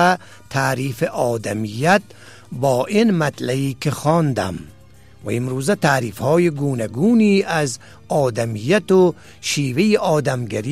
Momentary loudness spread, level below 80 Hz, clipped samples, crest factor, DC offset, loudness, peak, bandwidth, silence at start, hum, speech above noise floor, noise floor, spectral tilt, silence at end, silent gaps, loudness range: 9 LU; -54 dBFS; under 0.1%; 16 dB; 0.4%; -19 LUFS; -2 dBFS; 15.5 kHz; 0 s; none; 28 dB; -46 dBFS; -5.5 dB/octave; 0 s; none; 3 LU